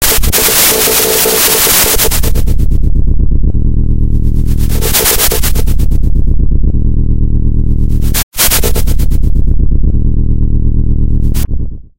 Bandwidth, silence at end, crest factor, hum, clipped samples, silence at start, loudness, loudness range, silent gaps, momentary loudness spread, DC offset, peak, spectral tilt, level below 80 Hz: 17 kHz; 0 s; 8 dB; none; 0.3%; 0 s; -11 LUFS; 5 LU; 8.23-8.32 s; 8 LU; under 0.1%; 0 dBFS; -3.5 dB/octave; -10 dBFS